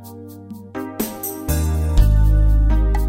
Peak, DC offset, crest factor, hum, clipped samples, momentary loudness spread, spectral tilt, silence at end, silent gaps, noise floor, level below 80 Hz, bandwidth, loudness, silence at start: -2 dBFS; under 0.1%; 14 dB; none; under 0.1%; 20 LU; -6.5 dB/octave; 0 s; none; -36 dBFS; -18 dBFS; 16.5 kHz; -19 LUFS; 0 s